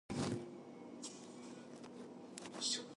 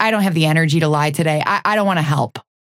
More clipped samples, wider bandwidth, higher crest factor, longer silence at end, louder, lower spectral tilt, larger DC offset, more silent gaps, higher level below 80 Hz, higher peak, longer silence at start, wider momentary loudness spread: neither; second, 11.5 kHz vs 15 kHz; about the same, 20 dB vs 16 dB; second, 0.05 s vs 0.25 s; second, -47 LUFS vs -16 LUFS; second, -3.5 dB/octave vs -6 dB/octave; neither; neither; second, -72 dBFS vs -58 dBFS; second, -26 dBFS vs 0 dBFS; about the same, 0.1 s vs 0 s; first, 14 LU vs 4 LU